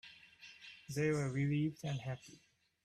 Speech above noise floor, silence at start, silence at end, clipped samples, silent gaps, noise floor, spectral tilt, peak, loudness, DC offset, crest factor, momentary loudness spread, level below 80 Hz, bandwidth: 22 dB; 0.05 s; 0.5 s; under 0.1%; none; -59 dBFS; -6.5 dB/octave; -24 dBFS; -38 LUFS; under 0.1%; 16 dB; 20 LU; -74 dBFS; 13.5 kHz